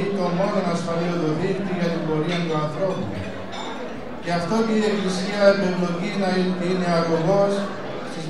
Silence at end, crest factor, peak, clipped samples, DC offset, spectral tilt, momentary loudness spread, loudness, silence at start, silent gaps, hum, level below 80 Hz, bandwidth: 0 s; 20 dB; -2 dBFS; under 0.1%; 2%; -6.5 dB/octave; 12 LU; -23 LUFS; 0 s; none; none; -56 dBFS; 11.5 kHz